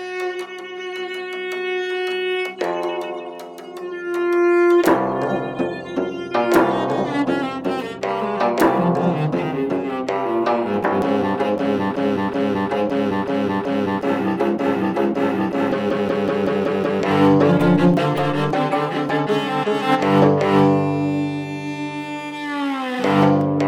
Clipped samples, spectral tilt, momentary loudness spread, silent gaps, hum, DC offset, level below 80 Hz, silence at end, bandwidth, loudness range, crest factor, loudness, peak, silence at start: under 0.1%; -7 dB/octave; 12 LU; none; none; under 0.1%; -58 dBFS; 0 s; 16 kHz; 3 LU; 14 dB; -20 LUFS; -6 dBFS; 0 s